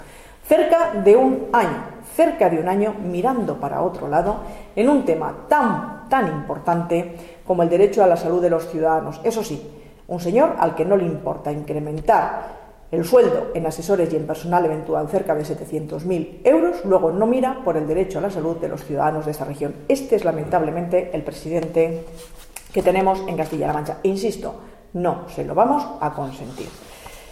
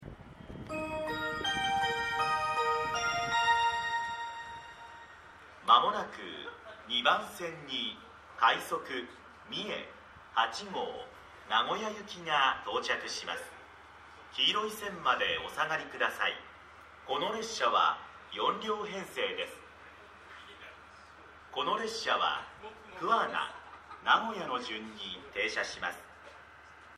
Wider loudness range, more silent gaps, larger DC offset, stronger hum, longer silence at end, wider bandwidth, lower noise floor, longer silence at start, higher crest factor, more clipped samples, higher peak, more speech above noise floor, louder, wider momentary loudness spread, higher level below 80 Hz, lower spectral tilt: about the same, 3 LU vs 5 LU; neither; neither; neither; about the same, 0 s vs 0 s; first, 16 kHz vs 14 kHz; second, -40 dBFS vs -54 dBFS; about the same, 0 s vs 0 s; second, 18 dB vs 24 dB; neither; first, -2 dBFS vs -10 dBFS; about the same, 21 dB vs 21 dB; first, -20 LUFS vs -32 LUFS; second, 14 LU vs 23 LU; first, -46 dBFS vs -64 dBFS; first, -6.5 dB/octave vs -2 dB/octave